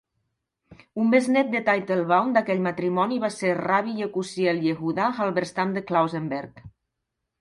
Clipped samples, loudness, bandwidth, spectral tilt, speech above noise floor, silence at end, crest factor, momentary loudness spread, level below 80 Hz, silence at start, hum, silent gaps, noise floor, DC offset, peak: under 0.1%; -24 LUFS; 11.5 kHz; -6 dB/octave; 58 dB; 0.7 s; 18 dB; 8 LU; -66 dBFS; 0.7 s; none; none; -82 dBFS; under 0.1%; -6 dBFS